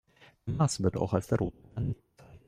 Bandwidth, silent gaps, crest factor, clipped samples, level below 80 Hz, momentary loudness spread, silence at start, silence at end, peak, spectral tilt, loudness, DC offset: 14.5 kHz; none; 20 dB; under 0.1%; -52 dBFS; 11 LU; 0.45 s; 0.1 s; -12 dBFS; -6.5 dB/octave; -31 LUFS; under 0.1%